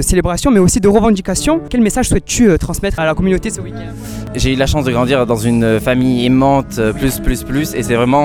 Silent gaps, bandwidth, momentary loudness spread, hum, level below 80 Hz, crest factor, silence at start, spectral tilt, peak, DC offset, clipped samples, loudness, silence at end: none; 18 kHz; 8 LU; none; -24 dBFS; 12 dB; 0 s; -5.5 dB/octave; 0 dBFS; under 0.1%; under 0.1%; -14 LUFS; 0 s